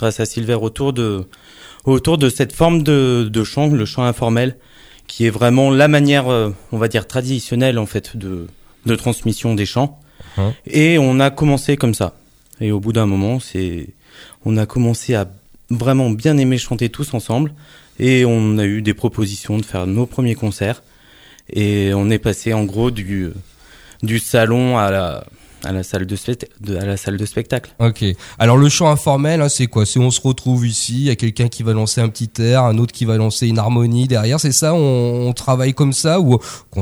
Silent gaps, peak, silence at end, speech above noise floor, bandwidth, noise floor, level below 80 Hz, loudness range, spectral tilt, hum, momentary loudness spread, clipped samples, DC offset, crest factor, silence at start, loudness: none; 0 dBFS; 0 s; 30 dB; over 20 kHz; -45 dBFS; -42 dBFS; 5 LU; -5.5 dB/octave; none; 11 LU; under 0.1%; under 0.1%; 16 dB; 0 s; -16 LUFS